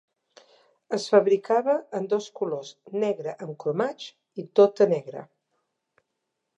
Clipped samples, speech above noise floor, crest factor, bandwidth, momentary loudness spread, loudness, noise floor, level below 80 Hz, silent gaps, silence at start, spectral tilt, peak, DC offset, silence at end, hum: under 0.1%; 56 dB; 20 dB; 8.6 kHz; 17 LU; -25 LUFS; -81 dBFS; -84 dBFS; none; 0.9 s; -5.5 dB/octave; -6 dBFS; under 0.1%; 1.35 s; none